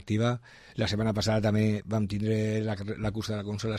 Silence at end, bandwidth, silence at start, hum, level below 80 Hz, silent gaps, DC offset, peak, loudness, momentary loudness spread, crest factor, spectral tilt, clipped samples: 0 s; 13 kHz; 0 s; none; -50 dBFS; none; under 0.1%; -14 dBFS; -29 LUFS; 7 LU; 14 dB; -6.5 dB/octave; under 0.1%